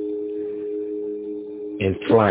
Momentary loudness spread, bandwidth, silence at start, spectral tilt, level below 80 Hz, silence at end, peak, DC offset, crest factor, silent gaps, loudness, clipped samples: 13 LU; 4 kHz; 0 s; -11 dB/octave; -48 dBFS; 0 s; -4 dBFS; under 0.1%; 18 dB; none; -25 LUFS; under 0.1%